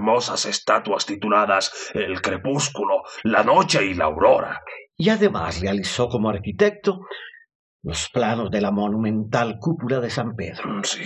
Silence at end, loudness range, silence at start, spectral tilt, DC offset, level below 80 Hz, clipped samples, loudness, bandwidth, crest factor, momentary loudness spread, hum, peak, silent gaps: 0 s; 4 LU; 0 s; -4.5 dB/octave; under 0.1%; -46 dBFS; under 0.1%; -21 LUFS; 10.5 kHz; 20 dB; 11 LU; none; -2 dBFS; 7.55-7.80 s